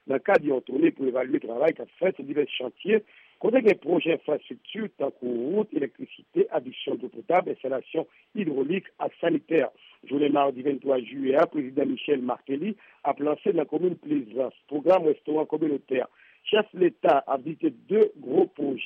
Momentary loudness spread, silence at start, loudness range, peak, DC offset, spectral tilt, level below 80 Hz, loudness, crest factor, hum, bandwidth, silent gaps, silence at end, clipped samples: 9 LU; 0.05 s; 3 LU; -10 dBFS; under 0.1%; -4.5 dB/octave; -78 dBFS; -26 LUFS; 16 dB; none; 5.6 kHz; none; 0 s; under 0.1%